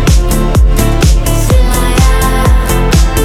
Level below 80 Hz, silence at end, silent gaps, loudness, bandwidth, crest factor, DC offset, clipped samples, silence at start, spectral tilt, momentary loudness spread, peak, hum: -10 dBFS; 0 s; none; -10 LUFS; 16.5 kHz; 8 dB; under 0.1%; under 0.1%; 0 s; -5 dB/octave; 1 LU; 0 dBFS; none